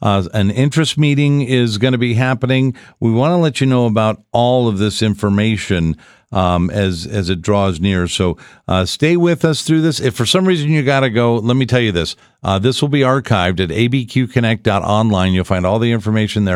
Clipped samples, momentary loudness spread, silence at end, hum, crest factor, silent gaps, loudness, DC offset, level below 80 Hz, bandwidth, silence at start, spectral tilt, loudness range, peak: under 0.1%; 5 LU; 0 s; none; 14 dB; none; -15 LUFS; under 0.1%; -40 dBFS; 13 kHz; 0 s; -6 dB/octave; 2 LU; 0 dBFS